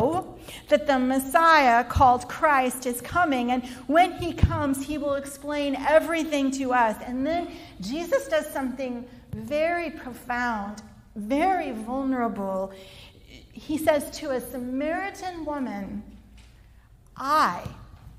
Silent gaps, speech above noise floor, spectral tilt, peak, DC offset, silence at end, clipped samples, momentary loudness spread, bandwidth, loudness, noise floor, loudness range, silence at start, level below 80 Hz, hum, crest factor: none; 28 dB; -5 dB/octave; -4 dBFS; under 0.1%; 0 s; under 0.1%; 17 LU; 16 kHz; -25 LUFS; -53 dBFS; 8 LU; 0 s; -44 dBFS; none; 20 dB